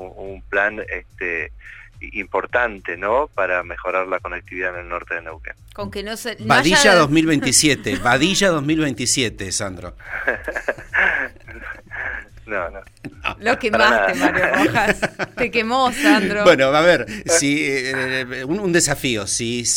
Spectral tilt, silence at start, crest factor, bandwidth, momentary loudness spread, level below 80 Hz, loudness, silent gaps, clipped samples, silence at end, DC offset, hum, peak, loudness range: -3 dB/octave; 0 s; 18 dB; 16.5 kHz; 16 LU; -42 dBFS; -18 LUFS; none; under 0.1%; 0 s; under 0.1%; none; -2 dBFS; 8 LU